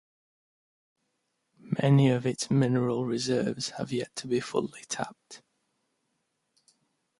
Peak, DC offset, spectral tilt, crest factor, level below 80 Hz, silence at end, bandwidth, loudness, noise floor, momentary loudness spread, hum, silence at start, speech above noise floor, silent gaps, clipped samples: -12 dBFS; under 0.1%; -6 dB/octave; 20 dB; -68 dBFS; 1.85 s; 11.5 kHz; -28 LUFS; -78 dBFS; 12 LU; none; 1.65 s; 51 dB; none; under 0.1%